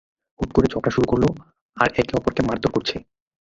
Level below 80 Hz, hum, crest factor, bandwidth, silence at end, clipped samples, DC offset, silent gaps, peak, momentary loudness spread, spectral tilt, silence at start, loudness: -40 dBFS; none; 22 dB; 7.8 kHz; 0.4 s; under 0.1%; under 0.1%; 1.61-1.69 s; 0 dBFS; 9 LU; -6.5 dB/octave; 0.4 s; -22 LUFS